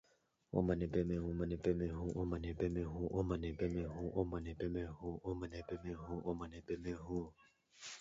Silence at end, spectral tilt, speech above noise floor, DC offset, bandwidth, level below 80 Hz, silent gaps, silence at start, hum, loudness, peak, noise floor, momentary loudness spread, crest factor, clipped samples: 0 s; -8 dB/octave; 36 dB; under 0.1%; 7.6 kHz; -52 dBFS; none; 0.55 s; none; -42 LUFS; -22 dBFS; -77 dBFS; 8 LU; 20 dB; under 0.1%